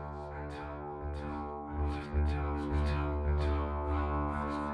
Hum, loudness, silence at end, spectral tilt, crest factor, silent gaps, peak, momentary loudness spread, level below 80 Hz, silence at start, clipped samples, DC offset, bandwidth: none; -35 LUFS; 0 s; -8.5 dB/octave; 12 dB; none; -22 dBFS; 9 LU; -36 dBFS; 0 s; under 0.1%; under 0.1%; 5.6 kHz